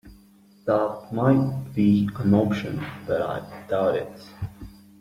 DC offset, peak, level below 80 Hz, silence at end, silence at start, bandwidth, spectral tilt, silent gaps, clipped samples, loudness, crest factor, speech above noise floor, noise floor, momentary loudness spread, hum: under 0.1%; -6 dBFS; -54 dBFS; 0.3 s; 0.05 s; 14.5 kHz; -8.5 dB/octave; none; under 0.1%; -24 LUFS; 18 dB; 31 dB; -54 dBFS; 16 LU; none